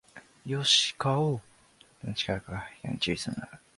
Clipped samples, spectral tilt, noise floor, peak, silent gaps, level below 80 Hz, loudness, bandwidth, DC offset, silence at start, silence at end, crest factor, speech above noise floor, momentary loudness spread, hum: under 0.1%; -3.5 dB/octave; -60 dBFS; -10 dBFS; none; -56 dBFS; -28 LUFS; 11.5 kHz; under 0.1%; 0.15 s; 0.2 s; 22 dB; 31 dB; 17 LU; none